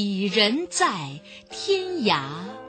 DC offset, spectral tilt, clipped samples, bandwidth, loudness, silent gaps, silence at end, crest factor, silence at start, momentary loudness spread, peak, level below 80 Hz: under 0.1%; -3.5 dB/octave; under 0.1%; 9.2 kHz; -23 LUFS; none; 0 s; 20 dB; 0 s; 16 LU; -6 dBFS; -66 dBFS